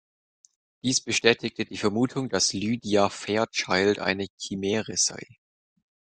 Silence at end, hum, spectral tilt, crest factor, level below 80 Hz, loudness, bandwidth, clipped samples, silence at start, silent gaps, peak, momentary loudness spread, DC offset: 0.8 s; none; -3 dB/octave; 26 dB; -64 dBFS; -25 LUFS; 10.5 kHz; under 0.1%; 0.85 s; 4.30-4.38 s; -2 dBFS; 9 LU; under 0.1%